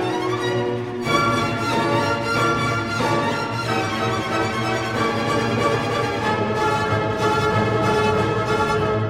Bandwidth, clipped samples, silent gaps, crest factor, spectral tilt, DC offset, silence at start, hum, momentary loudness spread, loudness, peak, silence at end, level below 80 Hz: 16 kHz; under 0.1%; none; 16 dB; -5.5 dB/octave; under 0.1%; 0 s; none; 4 LU; -21 LUFS; -4 dBFS; 0 s; -44 dBFS